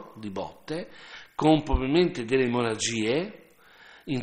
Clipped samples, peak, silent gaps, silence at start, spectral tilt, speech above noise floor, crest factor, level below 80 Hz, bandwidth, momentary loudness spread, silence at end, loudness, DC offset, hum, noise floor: under 0.1%; -8 dBFS; none; 0 s; -5 dB/octave; 27 dB; 20 dB; -40 dBFS; 10.5 kHz; 16 LU; 0 s; -26 LUFS; under 0.1%; none; -54 dBFS